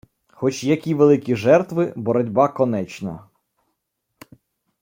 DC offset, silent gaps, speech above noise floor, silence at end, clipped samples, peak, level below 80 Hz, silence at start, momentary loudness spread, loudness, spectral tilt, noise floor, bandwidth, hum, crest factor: under 0.1%; none; 57 dB; 1.6 s; under 0.1%; -2 dBFS; -62 dBFS; 0.4 s; 14 LU; -19 LUFS; -7 dB/octave; -76 dBFS; 16.5 kHz; none; 18 dB